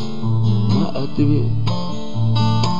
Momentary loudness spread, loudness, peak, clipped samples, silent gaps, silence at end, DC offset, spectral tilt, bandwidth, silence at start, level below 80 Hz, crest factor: 5 LU; -19 LUFS; -4 dBFS; under 0.1%; none; 0 s; 9%; -7.5 dB/octave; 7.4 kHz; 0 s; -38 dBFS; 12 dB